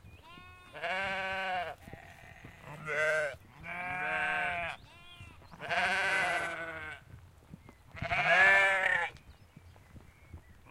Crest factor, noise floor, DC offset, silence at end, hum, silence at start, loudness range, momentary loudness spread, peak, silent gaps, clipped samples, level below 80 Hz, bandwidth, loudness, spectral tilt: 22 dB; -56 dBFS; under 0.1%; 0.15 s; none; 0.05 s; 7 LU; 27 LU; -12 dBFS; none; under 0.1%; -60 dBFS; 16 kHz; -30 LUFS; -3 dB/octave